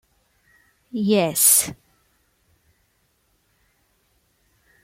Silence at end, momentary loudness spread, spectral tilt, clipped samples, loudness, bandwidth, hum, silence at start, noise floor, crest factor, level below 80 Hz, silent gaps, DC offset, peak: 3.1 s; 16 LU; -3 dB/octave; under 0.1%; -17 LUFS; 16.5 kHz; none; 0.95 s; -66 dBFS; 26 dB; -64 dBFS; none; under 0.1%; 0 dBFS